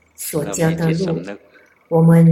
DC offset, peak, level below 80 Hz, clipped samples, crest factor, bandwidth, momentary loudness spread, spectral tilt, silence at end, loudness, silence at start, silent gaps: under 0.1%; -2 dBFS; -52 dBFS; under 0.1%; 14 dB; 16 kHz; 16 LU; -7 dB/octave; 0 s; -18 LUFS; 0.2 s; none